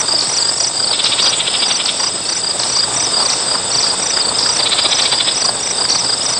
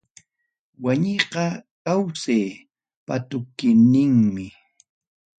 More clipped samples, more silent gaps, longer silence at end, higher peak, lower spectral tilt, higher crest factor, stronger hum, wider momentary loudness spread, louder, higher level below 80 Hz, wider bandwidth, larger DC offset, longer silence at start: neither; second, none vs 1.71-1.85 s, 2.96-3.06 s; second, 0 s vs 0.9 s; about the same, -2 dBFS vs -2 dBFS; second, 0.5 dB/octave vs -6.5 dB/octave; second, 14 dB vs 20 dB; neither; second, 3 LU vs 15 LU; first, -12 LUFS vs -21 LUFS; first, -52 dBFS vs -60 dBFS; first, 11.5 kHz vs 9 kHz; first, 0.2% vs under 0.1%; second, 0 s vs 0.8 s